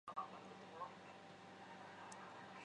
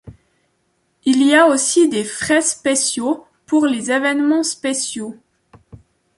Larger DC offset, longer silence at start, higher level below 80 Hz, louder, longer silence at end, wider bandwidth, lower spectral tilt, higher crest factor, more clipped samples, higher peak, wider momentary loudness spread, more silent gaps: neither; about the same, 0.05 s vs 0.05 s; second, -90 dBFS vs -58 dBFS; second, -55 LUFS vs -16 LUFS; second, 0 s vs 1.05 s; second, 10 kHz vs 11.5 kHz; first, -4 dB/octave vs -2 dB/octave; first, 22 dB vs 16 dB; neither; second, -32 dBFS vs -2 dBFS; second, 7 LU vs 11 LU; neither